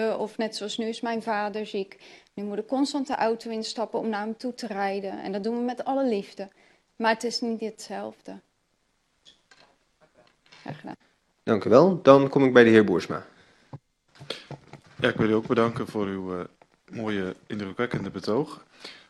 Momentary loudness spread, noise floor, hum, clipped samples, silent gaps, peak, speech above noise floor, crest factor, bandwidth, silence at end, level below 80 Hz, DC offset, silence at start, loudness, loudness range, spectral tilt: 22 LU; -71 dBFS; none; under 0.1%; none; -2 dBFS; 46 dB; 26 dB; 12 kHz; 0.15 s; -66 dBFS; under 0.1%; 0 s; -25 LUFS; 12 LU; -6 dB/octave